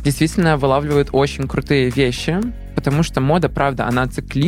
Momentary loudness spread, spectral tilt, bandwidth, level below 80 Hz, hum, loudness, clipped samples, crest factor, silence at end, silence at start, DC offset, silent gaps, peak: 6 LU; -6 dB/octave; 15.5 kHz; -32 dBFS; none; -18 LUFS; under 0.1%; 14 dB; 0 s; 0 s; under 0.1%; none; -2 dBFS